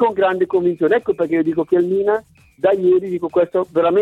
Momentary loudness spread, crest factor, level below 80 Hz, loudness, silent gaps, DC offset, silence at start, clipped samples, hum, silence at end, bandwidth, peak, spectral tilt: 3 LU; 14 dB; -58 dBFS; -17 LUFS; none; under 0.1%; 0 s; under 0.1%; none; 0 s; 4.1 kHz; -4 dBFS; -8 dB/octave